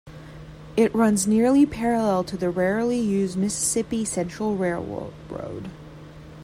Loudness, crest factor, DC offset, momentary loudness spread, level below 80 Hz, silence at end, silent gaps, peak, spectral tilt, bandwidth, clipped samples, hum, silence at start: -23 LUFS; 16 dB; under 0.1%; 23 LU; -50 dBFS; 0 s; none; -8 dBFS; -5 dB/octave; 15.5 kHz; under 0.1%; none; 0.05 s